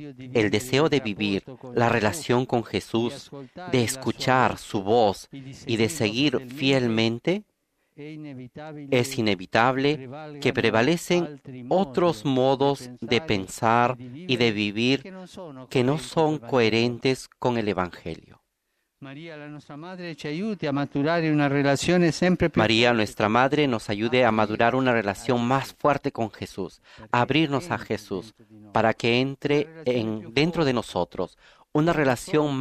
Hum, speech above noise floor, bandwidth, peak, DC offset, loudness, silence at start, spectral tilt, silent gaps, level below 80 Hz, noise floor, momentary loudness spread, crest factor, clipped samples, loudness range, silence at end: none; 52 dB; 14.5 kHz; -4 dBFS; under 0.1%; -24 LUFS; 0 s; -5.5 dB/octave; none; -56 dBFS; -76 dBFS; 17 LU; 22 dB; under 0.1%; 5 LU; 0 s